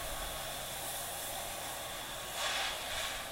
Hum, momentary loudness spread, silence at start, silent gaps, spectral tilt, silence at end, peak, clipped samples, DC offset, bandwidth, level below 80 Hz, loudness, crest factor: none; 6 LU; 0 s; none; -0.5 dB/octave; 0 s; -22 dBFS; under 0.1%; under 0.1%; 16 kHz; -54 dBFS; -38 LUFS; 18 dB